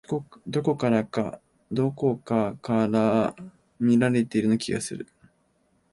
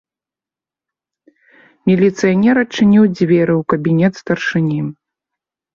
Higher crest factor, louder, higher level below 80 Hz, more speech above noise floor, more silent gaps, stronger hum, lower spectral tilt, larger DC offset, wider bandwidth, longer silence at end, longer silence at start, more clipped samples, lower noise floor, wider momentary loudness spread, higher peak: about the same, 16 dB vs 14 dB; second, -25 LUFS vs -14 LUFS; second, -62 dBFS vs -54 dBFS; second, 43 dB vs 76 dB; neither; neither; about the same, -6.5 dB/octave vs -7.5 dB/octave; neither; first, 11.5 kHz vs 7.4 kHz; about the same, 0.9 s vs 0.85 s; second, 0.1 s vs 1.85 s; neither; second, -67 dBFS vs -89 dBFS; first, 11 LU vs 8 LU; second, -10 dBFS vs -2 dBFS